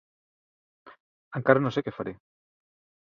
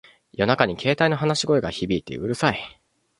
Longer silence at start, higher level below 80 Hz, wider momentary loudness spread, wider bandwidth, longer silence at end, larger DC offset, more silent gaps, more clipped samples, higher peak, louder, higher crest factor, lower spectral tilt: first, 0.85 s vs 0.4 s; second, -66 dBFS vs -50 dBFS; first, 15 LU vs 10 LU; second, 7.2 kHz vs 11.5 kHz; first, 0.9 s vs 0.5 s; neither; first, 1.00-1.31 s vs none; neither; about the same, -2 dBFS vs -2 dBFS; second, -27 LUFS vs -22 LUFS; first, 28 dB vs 22 dB; first, -8 dB/octave vs -5 dB/octave